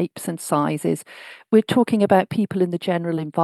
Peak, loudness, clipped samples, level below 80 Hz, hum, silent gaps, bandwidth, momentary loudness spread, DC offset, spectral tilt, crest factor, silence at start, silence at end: -2 dBFS; -21 LUFS; under 0.1%; -68 dBFS; none; none; 12.5 kHz; 11 LU; under 0.1%; -6 dB/octave; 18 dB; 0 s; 0 s